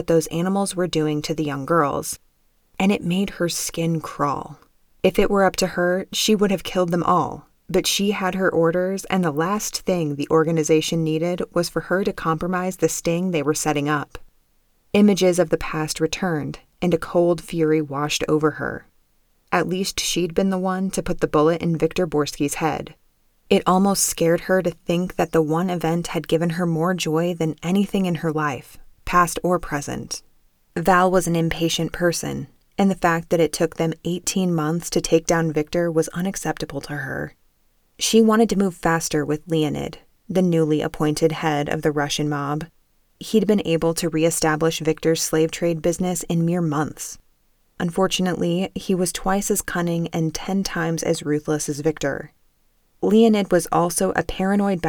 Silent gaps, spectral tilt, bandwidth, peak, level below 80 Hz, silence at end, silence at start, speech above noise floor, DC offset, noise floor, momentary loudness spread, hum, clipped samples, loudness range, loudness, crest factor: none; -5 dB/octave; over 20 kHz; -4 dBFS; -44 dBFS; 0 s; 0 s; 41 dB; under 0.1%; -62 dBFS; 8 LU; none; under 0.1%; 3 LU; -21 LUFS; 18 dB